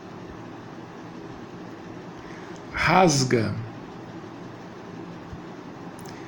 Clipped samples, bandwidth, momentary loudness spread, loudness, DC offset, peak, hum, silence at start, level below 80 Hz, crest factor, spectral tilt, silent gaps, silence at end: under 0.1%; 17 kHz; 21 LU; -22 LUFS; under 0.1%; -6 dBFS; none; 0 s; -52 dBFS; 24 dB; -4.5 dB/octave; none; 0 s